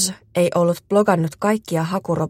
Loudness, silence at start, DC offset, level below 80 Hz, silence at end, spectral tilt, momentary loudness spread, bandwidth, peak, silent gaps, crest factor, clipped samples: -19 LUFS; 0 s; under 0.1%; -56 dBFS; 0 s; -5 dB/octave; 5 LU; 16.5 kHz; -2 dBFS; none; 16 dB; under 0.1%